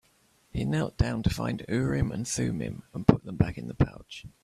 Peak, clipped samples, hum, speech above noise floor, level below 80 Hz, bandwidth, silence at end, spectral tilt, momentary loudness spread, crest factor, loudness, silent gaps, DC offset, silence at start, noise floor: -2 dBFS; under 0.1%; none; 37 dB; -42 dBFS; 14.5 kHz; 0.15 s; -6.5 dB/octave; 10 LU; 28 dB; -29 LUFS; none; under 0.1%; 0.55 s; -65 dBFS